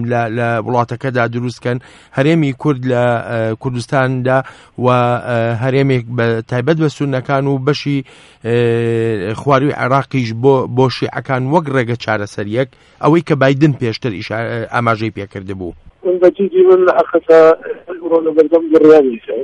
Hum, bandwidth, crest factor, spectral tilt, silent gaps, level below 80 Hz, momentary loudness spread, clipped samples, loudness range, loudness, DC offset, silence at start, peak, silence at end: none; 11 kHz; 14 dB; -7.5 dB/octave; none; -50 dBFS; 11 LU; under 0.1%; 4 LU; -14 LUFS; under 0.1%; 0 s; 0 dBFS; 0 s